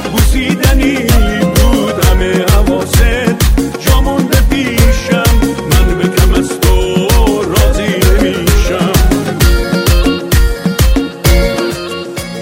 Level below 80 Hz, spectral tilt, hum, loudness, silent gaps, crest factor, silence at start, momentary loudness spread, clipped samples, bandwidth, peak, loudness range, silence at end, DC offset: -12 dBFS; -5 dB/octave; none; -11 LUFS; none; 10 dB; 0 s; 2 LU; 0.4%; 16.5 kHz; 0 dBFS; 1 LU; 0 s; under 0.1%